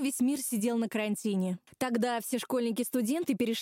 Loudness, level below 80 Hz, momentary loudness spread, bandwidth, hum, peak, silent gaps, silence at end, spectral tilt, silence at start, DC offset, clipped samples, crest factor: -31 LUFS; -78 dBFS; 3 LU; 16.5 kHz; none; -18 dBFS; none; 0 s; -4.5 dB/octave; 0 s; under 0.1%; under 0.1%; 14 dB